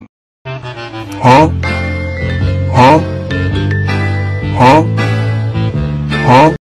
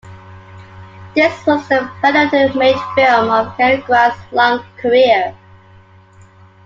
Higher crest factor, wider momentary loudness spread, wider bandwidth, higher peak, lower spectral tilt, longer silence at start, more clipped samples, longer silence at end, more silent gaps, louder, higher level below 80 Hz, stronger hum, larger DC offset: about the same, 10 dB vs 14 dB; first, 17 LU vs 5 LU; first, 12 kHz vs 7.6 kHz; about the same, 0 dBFS vs 0 dBFS; first, -7 dB/octave vs -5.5 dB/octave; about the same, 0 s vs 0.05 s; neither; second, 0.05 s vs 1.3 s; first, 0.09-0.45 s vs none; about the same, -11 LUFS vs -13 LUFS; first, -30 dBFS vs -54 dBFS; neither; neither